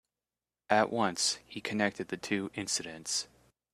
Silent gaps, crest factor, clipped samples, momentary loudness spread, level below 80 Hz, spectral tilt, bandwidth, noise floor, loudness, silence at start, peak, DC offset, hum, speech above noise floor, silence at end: none; 24 dB; under 0.1%; 8 LU; -72 dBFS; -2.5 dB/octave; 14.5 kHz; under -90 dBFS; -32 LUFS; 0.7 s; -10 dBFS; under 0.1%; none; over 58 dB; 0.5 s